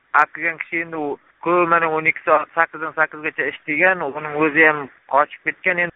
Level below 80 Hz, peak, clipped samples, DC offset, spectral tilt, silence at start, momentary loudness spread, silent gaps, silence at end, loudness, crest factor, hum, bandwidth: -64 dBFS; 0 dBFS; under 0.1%; under 0.1%; 1.5 dB/octave; 0.15 s; 10 LU; none; 0.05 s; -19 LUFS; 20 dB; none; 3.9 kHz